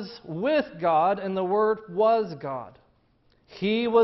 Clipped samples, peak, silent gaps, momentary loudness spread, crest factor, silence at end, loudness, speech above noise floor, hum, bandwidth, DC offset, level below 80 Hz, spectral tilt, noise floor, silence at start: under 0.1%; -10 dBFS; none; 12 LU; 16 dB; 0 s; -25 LUFS; 40 dB; none; 6 kHz; under 0.1%; -66 dBFS; -8 dB/octave; -64 dBFS; 0 s